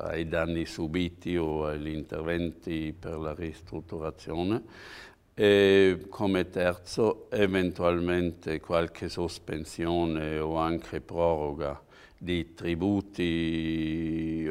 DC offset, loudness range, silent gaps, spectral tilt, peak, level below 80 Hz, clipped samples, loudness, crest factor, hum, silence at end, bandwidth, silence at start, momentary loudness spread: under 0.1%; 8 LU; none; -6.5 dB/octave; -8 dBFS; -48 dBFS; under 0.1%; -29 LUFS; 20 dB; none; 0 s; 15 kHz; 0 s; 11 LU